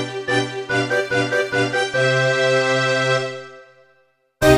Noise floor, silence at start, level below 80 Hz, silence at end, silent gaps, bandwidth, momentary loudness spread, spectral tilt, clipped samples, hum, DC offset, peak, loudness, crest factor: -61 dBFS; 0 s; -42 dBFS; 0 s; none; 15.5 kHz; 5 LU; -4.5 dB/octave; under 0.1%; none; under 0.1%; -2 dBFS; -19 LUFS; 18 dB